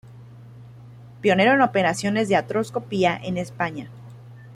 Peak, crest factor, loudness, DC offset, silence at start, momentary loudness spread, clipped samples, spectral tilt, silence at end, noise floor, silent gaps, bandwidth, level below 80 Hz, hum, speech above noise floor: -6 dBFS; 18 dB; -22 LUFS; under 0.1%; 0.05 s; 12 LU; under 0.1%; -5.5 dB/octave; 0 s; -43 dBFS; none; 14.5 kHz; -60 dBFS; none; 22 dB